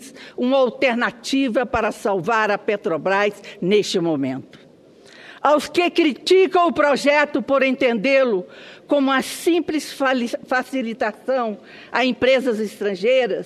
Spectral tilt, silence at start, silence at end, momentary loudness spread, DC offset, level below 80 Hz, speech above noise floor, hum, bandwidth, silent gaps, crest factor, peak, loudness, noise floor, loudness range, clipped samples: -4.5 dB/octave; 0 s; 0 s; 8 LU; under 0.1%; -56 dBFS; 29 dB; none; 13.5 kHz; none; 18 dB; -2 dBFS; -19 LUFS; -48 dBFS; 4 LU; under 0.1%